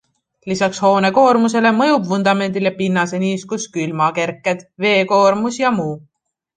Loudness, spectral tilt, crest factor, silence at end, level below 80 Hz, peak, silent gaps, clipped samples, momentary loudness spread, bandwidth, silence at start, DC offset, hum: -16 LUFS; -5 dB/octave; 14 dB; 0.6 s; -62 dBFS; -2 dBFS; none; under 0.1%; 10 LU; 9.6 kHz; 0.45 s; under 0.1%; none